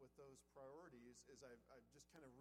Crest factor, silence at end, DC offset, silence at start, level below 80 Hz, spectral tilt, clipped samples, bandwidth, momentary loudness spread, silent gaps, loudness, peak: 16 dB; 0 s; under 0.1%; 0 s; -84 dBFS; -4.5 dB/octave; under 0.1%; 13.5 kHz; 6 LU; none; -65 LUFS; -48 dBFS